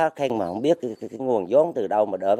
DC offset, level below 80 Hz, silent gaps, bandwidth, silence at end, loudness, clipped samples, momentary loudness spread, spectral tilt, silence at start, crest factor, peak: under 0.1%; -68 dBFS; none; 10.5 kHz; 0 s; -23 LUFS; under 0.1%; 6 LU; -6.5 dB/octave; 0 s; 16 dB; -8 dBFS